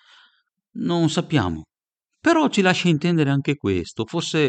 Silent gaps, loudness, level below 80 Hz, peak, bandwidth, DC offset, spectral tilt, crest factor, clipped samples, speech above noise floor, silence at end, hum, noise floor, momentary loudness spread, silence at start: none; -21 LUFS; -52 dBFS; -4 dBFS; 9 kHz; under 0.1%; -5.5 dB/octave; 18 dB; under 0.1%; 61 dB; 0 s; none; -81 dBFS; 10 LU; 0.75 s